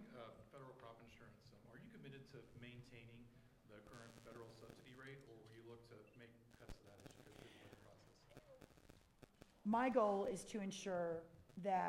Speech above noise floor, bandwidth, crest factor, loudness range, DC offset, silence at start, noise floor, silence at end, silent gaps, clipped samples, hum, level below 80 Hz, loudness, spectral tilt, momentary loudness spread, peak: 22 dB; 16 kHz; 22 dB; 19 LU; under 0.1%; 0 s; -68 dBFS; 0 s; none; under 0.1%; none; -74 dBFS; -46 LUFS; -5.5 dB/octave; 24 LU; -26 dBFS